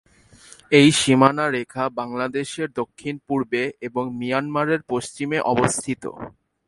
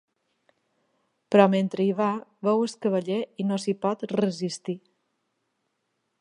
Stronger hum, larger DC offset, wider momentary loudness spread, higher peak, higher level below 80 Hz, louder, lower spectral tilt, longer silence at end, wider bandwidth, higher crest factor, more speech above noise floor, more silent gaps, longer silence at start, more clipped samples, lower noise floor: neither; neither; first, 14 LU vs 11 LU; about the same, 0 dBFS vs -2 dBFS; first, -56 dBFS vs -78 dBFS; first, -21 LUFS vs -25 LUFS; second, -4.5 dB/octave vs -6.5 dB/octave; second, 0.4 s vs 1.45 s; about the same, 11.5 kHz vs 10.5 kHz; about the same, 22 dB vs 24 dB; second, 28 dB vs 52 dB; neither; second, 0.7 s vs 1.3 s; neither; second, -49 dBFS vs -77 dBFS